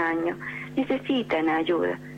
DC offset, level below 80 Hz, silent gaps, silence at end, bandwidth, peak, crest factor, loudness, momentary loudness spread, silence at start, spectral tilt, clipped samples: under 0.1%; -60 dBFS; none; 0 s; 8.8 kHz; -14 dBFS; 12 dB; -26 LUFS; 6 LU; 0 s; -6.5 dB/octave; under 0.1%